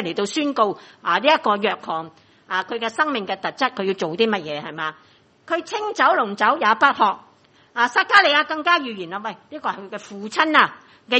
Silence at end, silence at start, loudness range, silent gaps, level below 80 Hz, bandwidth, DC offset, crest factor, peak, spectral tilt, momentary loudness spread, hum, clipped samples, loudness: 0 s; 0 s; 6 LU; none; -72 dBFS; 8.4 kHz; under 0.1%; 22 dB; 0 dBFS; -3.5 dB/octave; 13 LU; none; under 0.1%; -20 LUFS